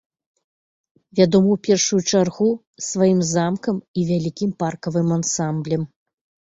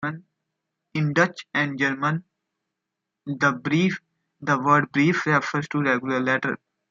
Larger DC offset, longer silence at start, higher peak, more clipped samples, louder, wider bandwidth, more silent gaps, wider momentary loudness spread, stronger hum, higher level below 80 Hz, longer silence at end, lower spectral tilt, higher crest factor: neither; first, 1.15 s vs 0 s; first, -2 dBFS vs -6 dBFS; neither; first, -20 LUFS vs -23 LUFS; about the same, 8 kHz vs 7.4 kHz; first, 2.67-2.74 s, 3.88-3.94 s vs none; second, 9 LU vs 13 LU; neither; first, -58 dBFS vs -68 dBFS; first, 0.65 s vs 0.35 s; about the same, -5.5 dB/octave vs -6 dB/octave; about the same, 18 dB vs 20 dB